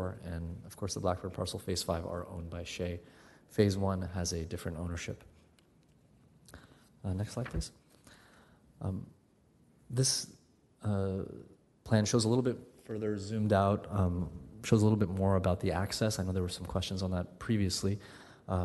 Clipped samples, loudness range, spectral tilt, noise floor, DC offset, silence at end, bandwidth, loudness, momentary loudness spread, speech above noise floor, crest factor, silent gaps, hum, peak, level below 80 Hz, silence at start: under 0.1%; 11 LU; -5.5 dB/octave; -66 dBFS; under 0.1%; 0 s; 12 kHz; -34 LUFS; 14 LU; 34 dB; 22 dB; none; none; -12 dBFS; -54 dBFS; 0 s